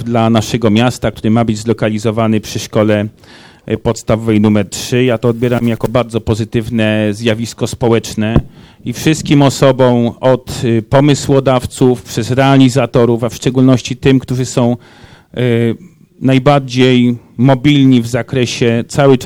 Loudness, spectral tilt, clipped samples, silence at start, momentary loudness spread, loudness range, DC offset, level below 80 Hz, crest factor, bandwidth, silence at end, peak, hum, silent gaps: -12 LUFS; -6 dB/octave; 0.3%; 0 s; 7 LU; 3 LU; under 0.1%; -38 dBFS; 12 dB; 16.5 kHz; 0 s; 0 dBFS; none; none